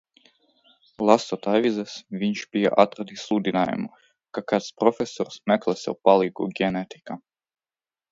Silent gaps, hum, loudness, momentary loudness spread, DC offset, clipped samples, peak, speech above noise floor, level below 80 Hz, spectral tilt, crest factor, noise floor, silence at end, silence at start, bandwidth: none; none; -23 LUFS; 15 LU; under 0.1%; under 0.1%; 0 dBFS; over 67 dB; -66 dBFS; -5.5 dB/octave; 24 dB; under -90 dBFS; 0.95 s; 1 s; 7.8 kHz